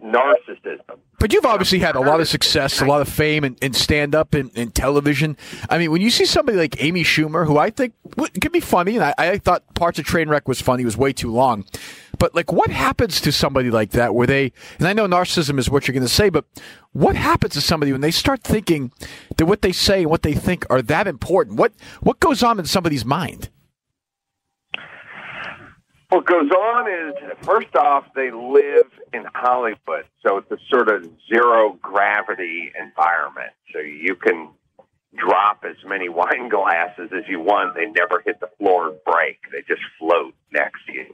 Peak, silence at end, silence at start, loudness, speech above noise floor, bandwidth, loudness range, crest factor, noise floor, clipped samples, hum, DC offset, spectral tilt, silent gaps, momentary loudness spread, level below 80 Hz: -4 dBFS; 0.1 s; 0 s; -18 LUFS; 63 dB; 16 kHz; 4 LU; 14 dB; -81 dBFS; under 0.1%; none; under 0.1%; -4.5 dB/octave; none; 12 LU; -40 dBFS